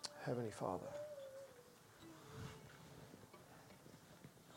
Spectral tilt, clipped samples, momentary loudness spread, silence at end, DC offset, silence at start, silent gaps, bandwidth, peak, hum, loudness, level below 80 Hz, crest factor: -5 dB/octave; under 0.1%; 17 LU; 0 s; under 0.1%; 0 s; none; 16.5 kHz; -26 dBFS; none; -51 LUFS; -78 dBFS; 26 dB